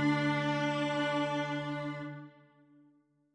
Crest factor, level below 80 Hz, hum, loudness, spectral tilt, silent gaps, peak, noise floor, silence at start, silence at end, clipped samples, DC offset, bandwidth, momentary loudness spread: 16 dB; -72 dBFS; none; -33 LUFS; -6 dB/octave; none; -18 dBFS; -68 dBFS; 0 s; 1.05 s; under 0.1%; under 0.1%; 10 kHz; 12 LU